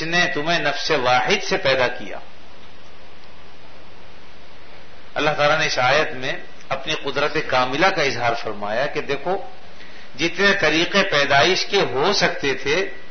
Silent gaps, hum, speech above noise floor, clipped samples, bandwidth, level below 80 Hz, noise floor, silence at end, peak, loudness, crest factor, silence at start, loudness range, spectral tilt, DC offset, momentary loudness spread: none; none; 25 dB; under 0.1%; 6.6 kHz; -48 dBFS; -45 dBFS; 0 s; -2 dBFS; -19 LUFS; 20 dB; 0 s; 8 LU; -3.5 dB/octave; 4%; 11 LU